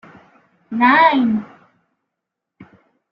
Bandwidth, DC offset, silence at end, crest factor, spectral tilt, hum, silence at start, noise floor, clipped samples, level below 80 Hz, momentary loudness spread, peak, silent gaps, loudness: 5.6 kHz; under 0.1%; 0.5 s; 18 dB; -7.5 dB/octave; none; 0.7 s; -81 dBFS; under 0.1%; -64 dBFS; 13 LU; -2 dBFS; none; -14 LUFS